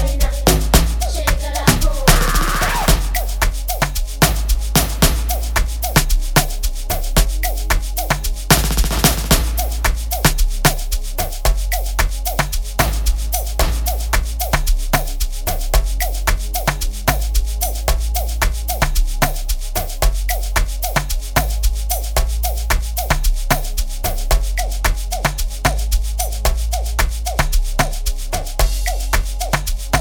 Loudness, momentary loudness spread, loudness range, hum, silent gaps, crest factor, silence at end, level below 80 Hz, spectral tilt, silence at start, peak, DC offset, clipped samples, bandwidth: -19 LUFS; 6 LU; 3 LU; none; none; 16 dB; 0 s; -18 dBFS; -3.5 dB/octave; 0 s; 0 dBFS; under 0.1%; under 0.1%; 19.5 kHz